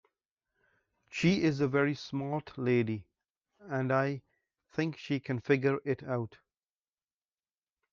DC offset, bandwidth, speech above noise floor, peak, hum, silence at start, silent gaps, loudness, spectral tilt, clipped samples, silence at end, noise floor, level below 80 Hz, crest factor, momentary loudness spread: under 0.1%; 7.6 kHz; over 59 dB; -14 dBFS; none; 1.1 s; 3.30-3.34 s; -32 LUFS; -7 dB/octave; under 0.1%; 1.65 s; under -90 dBFS; -70 dBFS; 20 dB; 10 LU